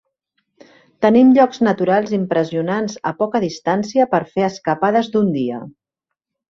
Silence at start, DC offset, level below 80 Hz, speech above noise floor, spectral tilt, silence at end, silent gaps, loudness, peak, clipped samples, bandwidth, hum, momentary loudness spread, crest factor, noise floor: 1 s; under 0.1%; -60 dBFS; 66 dB; -6.5 dB/octave; 0.8 s; none; -17 LUFS; -2 dBFS; under 0.1%; 7.4 kHz; none; 10 LU; 16 dB; -82 dBFS